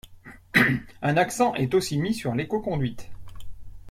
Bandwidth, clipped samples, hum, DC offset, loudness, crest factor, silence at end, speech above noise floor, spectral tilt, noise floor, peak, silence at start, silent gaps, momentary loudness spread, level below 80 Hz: 16.5 kHz; under 0.1%; none; under 0.1%; -24 LUFS; 20 dB; 0 s; 22 dB; -5.5 dB/octave; -47 dBFS; -6 dBFS; 0.05 s; none; 8 LU; -48 dBFS